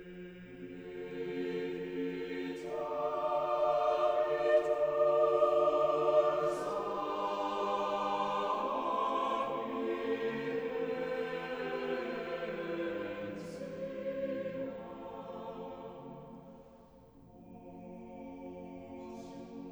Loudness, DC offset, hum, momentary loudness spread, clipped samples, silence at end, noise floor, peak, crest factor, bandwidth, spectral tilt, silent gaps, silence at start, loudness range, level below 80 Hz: -34 LUFS; under 0.1%; none; 19 LU; under 0.1%; 0 s; -58 dBFS; -16 dBFS; 18 dB; over 20 kHz; -6 dB/octave; none; 0 s; 18 LU; -68 dBFS